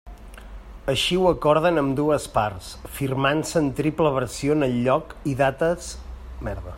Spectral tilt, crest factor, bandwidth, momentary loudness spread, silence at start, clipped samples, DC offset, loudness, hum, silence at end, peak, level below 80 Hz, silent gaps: -5.5 dB/octave; 18 dB; 16 kHz; 16 LU; 0.05 s; under 0.1%; under 0.1%; -23 LUFS; none; 0 s; -4 dBFS; -40 dBFS; none